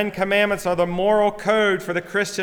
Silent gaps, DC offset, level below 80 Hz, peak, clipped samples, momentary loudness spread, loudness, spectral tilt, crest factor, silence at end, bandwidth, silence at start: none; under 0.1%; -50 dBFS; -4 dBFS; under 0.1%; 5 LU; -20 LUFS; -4.5 dB/octave; 16 dB; 0 s; 19 kHz; 0 s